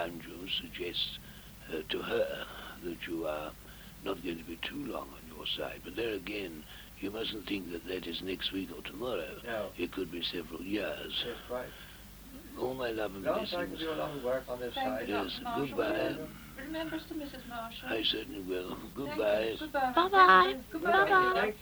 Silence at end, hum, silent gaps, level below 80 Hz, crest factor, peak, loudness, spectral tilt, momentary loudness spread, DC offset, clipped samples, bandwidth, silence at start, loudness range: 0 s; none; none; -56 dBFS; 24 dB; -10 dBFS; -33 LUFS; -4 dB/octave; 14 LU; under 0.1%; under 0.1%; over 20 kHz; 0 s; 10 LU